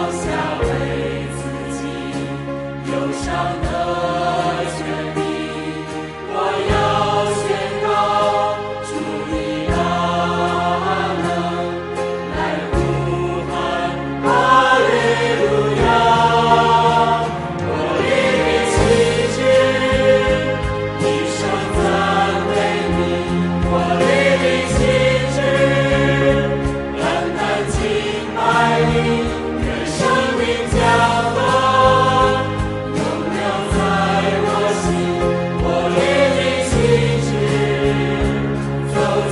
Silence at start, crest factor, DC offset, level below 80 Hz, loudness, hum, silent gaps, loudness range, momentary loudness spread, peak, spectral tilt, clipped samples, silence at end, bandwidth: 0 s; 16 dB; under 0.1%; -32 dBFS; -17 LUFS; none; none; 6 LU; 9 LU; 0 dBFS; -5.5 dB/octave; under 0.1%; 0 s; 11.5 kHz